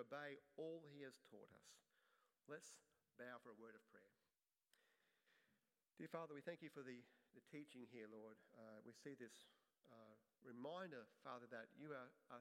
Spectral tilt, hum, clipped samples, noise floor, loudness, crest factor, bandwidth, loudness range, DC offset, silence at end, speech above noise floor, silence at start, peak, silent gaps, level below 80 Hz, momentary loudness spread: -5 dB/octave; none; under 0.1%; under -90 dBFS; -59 LUFS; 24 dB; 15.5 kHz; 6 LU; under 0.1%; 0 s; over 31 dB; 0 s; -36 dBFS; none; under -90 dBFS; 12 LU